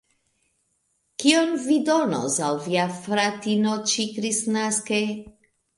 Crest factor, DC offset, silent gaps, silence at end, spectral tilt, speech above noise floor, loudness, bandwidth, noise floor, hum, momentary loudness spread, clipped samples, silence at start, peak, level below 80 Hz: 20 dB; under 0.1%; none; 0.45 s; -3.5 dB/octave; 48 dB; -23 LUFS; 11.5 kHz; -71 dBFS; none; 5 LU; under 0.1%; 1.2 s; -4 dBFS; -66 dBFS